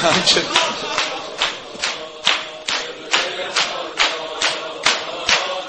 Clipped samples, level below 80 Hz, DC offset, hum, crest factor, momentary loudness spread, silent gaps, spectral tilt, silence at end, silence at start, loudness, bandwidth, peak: under 0.1%; -54 dBFS; under 0.1%; none; 20 dB; 9 LU; none; -1 dB/octave; 0 s; 0 s; -19 LUFS; 8.8 kHz; 0 dBFS